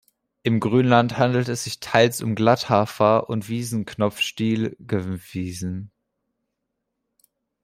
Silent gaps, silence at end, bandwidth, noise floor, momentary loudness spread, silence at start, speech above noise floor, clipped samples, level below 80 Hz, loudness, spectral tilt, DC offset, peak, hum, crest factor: none; 1.75 s; 16 kHz; -79 dBFS; 11 LU; 0.45 s; 58 dB; under 0.1%; -60 dBFS; -22 LUFS; -5.5 dB/octave; under 0.1%; -2 dBFS; none; 20 dB